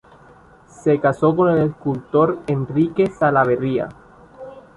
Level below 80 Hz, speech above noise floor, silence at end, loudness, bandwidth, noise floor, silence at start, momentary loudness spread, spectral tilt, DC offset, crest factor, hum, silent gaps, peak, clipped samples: -52 dBFS; 30 dB; 0.15 s; -19 LUFS; 11 kHz; -47 dBFS; 0.85 s; 11 LU; -8.5 dB/octave; under 0.1%; 16 dB; none; none; -2 dBFS; under 0.1%